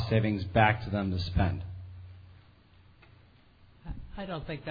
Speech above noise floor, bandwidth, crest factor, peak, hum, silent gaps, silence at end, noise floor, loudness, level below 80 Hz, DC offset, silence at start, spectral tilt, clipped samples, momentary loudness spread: 30 dB; 5 kHz; 24 dB; -8 dBFS; none; none; 0 s; -59 dBFS; -30 LUFS; -46 dBFS; under 0.1%; 0 s; -8.5 dB/octave; under 0.1%; 23 LU